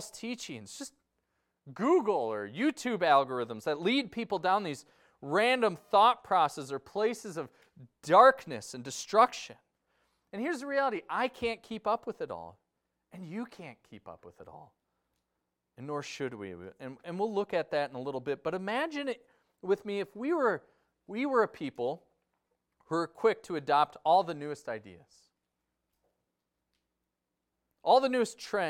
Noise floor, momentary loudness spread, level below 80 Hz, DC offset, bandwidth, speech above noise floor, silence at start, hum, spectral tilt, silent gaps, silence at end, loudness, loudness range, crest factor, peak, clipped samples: -86 dBFS; 19 LU; -74 dBFS; under 0.1%; 16 kHz; 55 dB; 0 s; none; -4.5 dB/octave; none; 0 s; -30 LUFS; 15 LU; 24 dB; -8 dBFS; under 0.1%